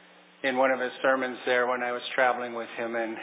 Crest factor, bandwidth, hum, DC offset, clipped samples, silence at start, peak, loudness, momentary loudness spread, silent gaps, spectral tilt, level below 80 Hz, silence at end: 18 dB; 4 kHz; none; under 0.1%; under 0.1%; 0.45 s; -10 dBFS; -27 LUFS; 7 LU; none; -7 dB/octave; under -90 dBFS; 0 s